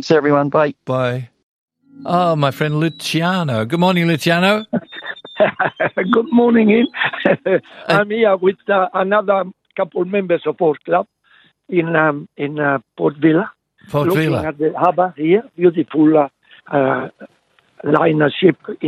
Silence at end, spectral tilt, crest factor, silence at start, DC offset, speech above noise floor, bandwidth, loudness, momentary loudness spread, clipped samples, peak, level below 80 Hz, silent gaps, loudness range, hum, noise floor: 0 s; -6.5 dB/octave; 16 dB; 0 s; under 0.1%; 38 dB; 13.5 kHz; -16 LUFS; 9 LU; under 0.1%; 0 dBFS; -62 dBFS; 1.43-1.68 s; 3 LU; none; -53 dBFS